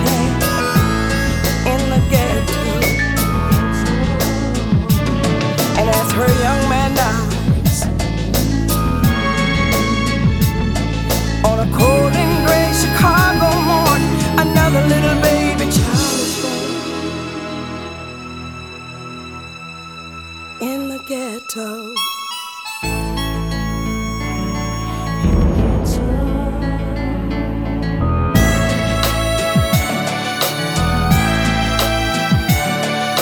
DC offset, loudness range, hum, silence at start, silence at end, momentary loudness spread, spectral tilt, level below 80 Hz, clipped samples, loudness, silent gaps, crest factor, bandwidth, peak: under 0.1%; 11 LU; none; 0 s; 0 s; 12 LU; -5 dB/octave; -24 dBFS; under 0.1%; -16 LUFS; none; 16 dB; 19 kHz; 0 dBFS